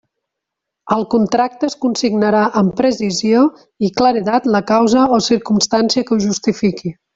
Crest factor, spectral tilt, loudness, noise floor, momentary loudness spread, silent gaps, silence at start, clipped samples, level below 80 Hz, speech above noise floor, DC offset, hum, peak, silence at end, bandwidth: 14 dB; -5 dB/octave; -15 LUFS; -80 dBFS; 6 LU; none; 0.85 s; under 0.1%; -52 dBFS; 65 dB; under 0.1%; none; -2 dBFS; 0.25 s; 8 kHz